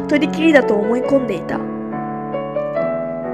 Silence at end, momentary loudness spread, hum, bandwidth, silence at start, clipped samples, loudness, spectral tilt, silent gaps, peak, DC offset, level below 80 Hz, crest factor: 0 s; 12 LU; none; 10.5 kHz; 0 s; under 0.1%; -18 LUFS; -6.5 dB/octave; none; 0 dBFS; under 0.1%; -50 dBFS; 18 dB